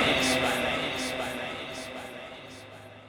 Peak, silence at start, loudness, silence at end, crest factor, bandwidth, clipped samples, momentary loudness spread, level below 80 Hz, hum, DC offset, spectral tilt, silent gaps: -12 dBFS; 0 s; -29 LUFS; 0 s; 18 dB; over 20 kHz; under 0.1%; 20 LU; -54 dBFS; none; under 0.1%; -3 dB/octave; none